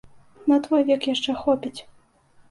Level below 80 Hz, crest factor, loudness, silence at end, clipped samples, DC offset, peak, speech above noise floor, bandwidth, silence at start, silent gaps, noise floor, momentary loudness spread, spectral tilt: -60 dBFS; 16 dB; -22 LUFS; 0.7 s; under 0.1%; under 0.1%; -8 dBFS; 34 dB; 11.5 kHz; 0.45 s; none; -56 dBFS; 11 LU; -4.5 dB/octave